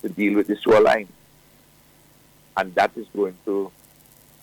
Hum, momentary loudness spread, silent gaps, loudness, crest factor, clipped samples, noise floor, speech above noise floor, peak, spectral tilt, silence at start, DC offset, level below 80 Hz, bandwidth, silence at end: none; 13 LU; none; -21 LUFS; 16 dB; under 0.1%; -54 dBFS; 34 dB; -8 dBFS; -5.5 dB/octave; 0.05 s; under 0.1%; -60 dBFS; 20 kHz; 0.75 s